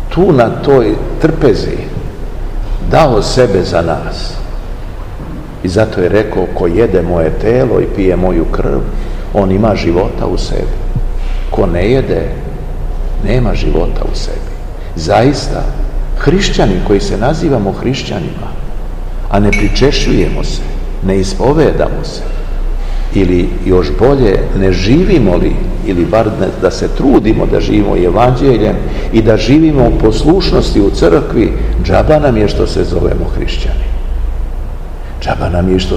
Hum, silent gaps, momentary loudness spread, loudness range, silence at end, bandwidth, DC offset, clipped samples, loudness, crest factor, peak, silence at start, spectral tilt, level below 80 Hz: none; none; 14 LU; 5 LU; 0 s; 9.6 kHz; 0.9%; 1%; -12 LUFS; 10 dB; 0 dBFS; 0 s; -6.5 dB/octave; -16 dBFS